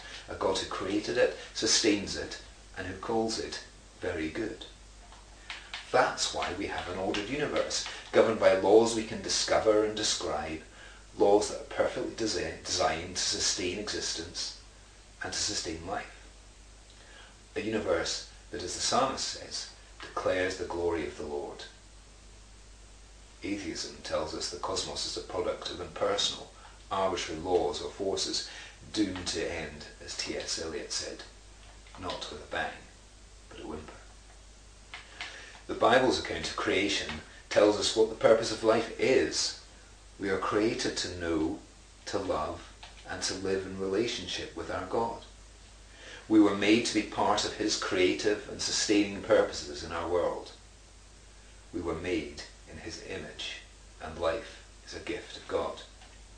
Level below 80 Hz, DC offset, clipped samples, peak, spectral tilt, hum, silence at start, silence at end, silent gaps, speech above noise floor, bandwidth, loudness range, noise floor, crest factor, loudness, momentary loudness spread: -54 dBFS; under 0.1%; under 0.1%; -8 dBFS; -3 dB/octave; none; 0 s; 0 s; none; 23 dB; 10.5 kHz; 11 LU; -54 dBFS; 24 dB; -30 LUFS; 19 LU